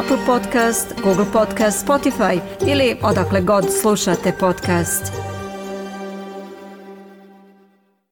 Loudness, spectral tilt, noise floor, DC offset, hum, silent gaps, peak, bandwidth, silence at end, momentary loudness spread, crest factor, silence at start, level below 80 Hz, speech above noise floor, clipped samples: -18 LUFS; -4.5 dB/octave; -57 dBFS; under 0.1%; none; none; -6 dBFS; 18 kHz; 0.9 s; 15 LU; 14 dB; 0 s; -46 dBFS; 40 dB; under 0.1%